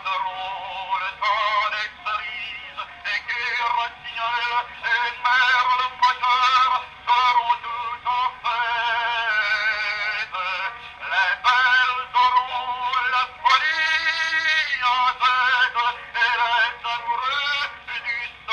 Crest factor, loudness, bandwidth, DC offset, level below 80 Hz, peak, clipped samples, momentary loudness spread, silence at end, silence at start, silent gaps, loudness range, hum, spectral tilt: 18 dB; -21 LUFS; 9.6 kHz; under 0.1%; -58 dBFS; -4 dBFS; under 0.1%; 10 LU; 0 s; 0 s; none; 5 LU; none; 0 dB/octave